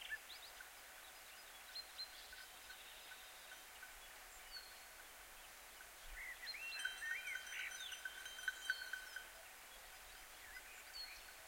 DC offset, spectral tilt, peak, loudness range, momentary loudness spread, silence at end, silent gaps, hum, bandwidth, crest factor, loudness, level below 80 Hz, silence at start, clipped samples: under 0.1%; 1 dB/octave; -28 dBFS; 9 LU; 11 LU; 0 s; none; none; 16.5 kHz; 26 dB; -50 LUFS; -72 dBFS; 0 s; under 0.1%